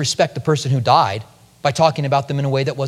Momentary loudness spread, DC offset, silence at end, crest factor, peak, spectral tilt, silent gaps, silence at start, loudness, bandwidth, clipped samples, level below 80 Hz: 7 LU; under 0.1%; 0 s; 18 dB; 0 dBFS; -5 dB/octave; none; 0 s; -18 LUFS; 13 kHz; under 0.1%; -56 dBFS